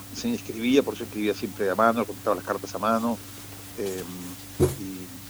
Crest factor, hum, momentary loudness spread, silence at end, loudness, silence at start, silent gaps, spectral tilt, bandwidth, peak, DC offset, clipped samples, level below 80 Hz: 22 dB; none; 14 LU; 0 s; -27 LUFS; 0 s; none; -5 dB/octave; over 20 kHz; -6 dBFS; under 0.1%; under 0.1%; -50 dBFS